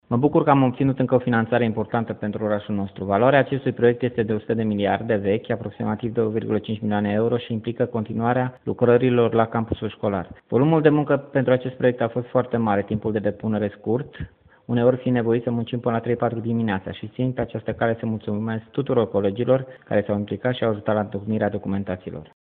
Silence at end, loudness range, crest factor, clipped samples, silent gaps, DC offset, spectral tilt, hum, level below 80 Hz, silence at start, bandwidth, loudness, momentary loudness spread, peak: 0.3 s; 4 LU; 20 dB; under 0.1%; none; under 0.1%; -6.5 dB/octave; none; -54 dBFS; 0.1 s; 4.2 kHz; -22 LUFS; 9 LU; -2 dBFS